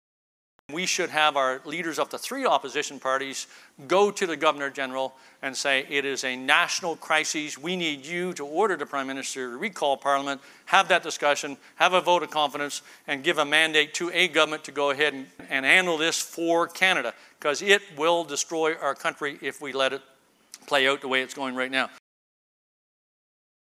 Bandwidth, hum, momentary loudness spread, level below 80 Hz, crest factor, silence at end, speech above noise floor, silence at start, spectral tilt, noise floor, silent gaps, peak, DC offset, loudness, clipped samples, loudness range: 16 kHz; none; 11 LU; -82 dBFS; 24 dB; 1.7 s; 26 dB; 0.7 s; -2 dB/octave; -52 dBFS; none; -2 dBFS; under 0.1%; -25 LUFS; under 0.1%; 5 LU